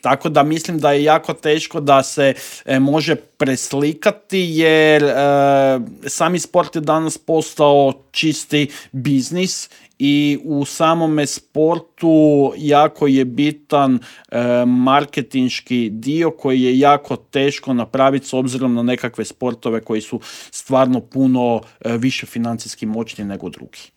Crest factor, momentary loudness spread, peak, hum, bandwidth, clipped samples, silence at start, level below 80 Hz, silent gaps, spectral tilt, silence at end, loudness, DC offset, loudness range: 16 dB; 10 LU; 0 dBFS; none; 17 kHz; under 0.1%; 0.05 s; -62 dBFS; none; -5 dB/octave; 0.1 s; -16 LUFS; under 0.1%; 4 LU